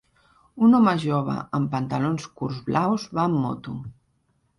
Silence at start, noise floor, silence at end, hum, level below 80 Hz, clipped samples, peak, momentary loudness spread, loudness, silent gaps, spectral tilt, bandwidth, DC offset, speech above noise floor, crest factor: 0.55 s; -68 dBFS; 0.65 s; none; -58 dBFS; under 0.1%; -8 dBFS; 14 LU; -23 LUFS; none; -7.5 dB/octave; 11.5 kHz; under 0.1%; 45 dB; 16 dB